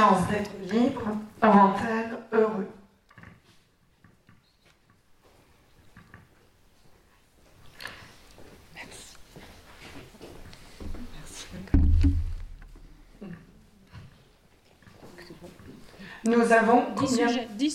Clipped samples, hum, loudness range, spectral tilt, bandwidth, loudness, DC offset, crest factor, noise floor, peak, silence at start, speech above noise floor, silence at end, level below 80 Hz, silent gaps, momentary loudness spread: under 0.1%; none; 23 LU; -6 dB/octave; 14 kHz; -24 LUFS; under 0.1%; 20 dB; -63 dBFS; -8 dBFS; 0 s; 40 dB; 0 s; -36 dBFS; none; 28 LU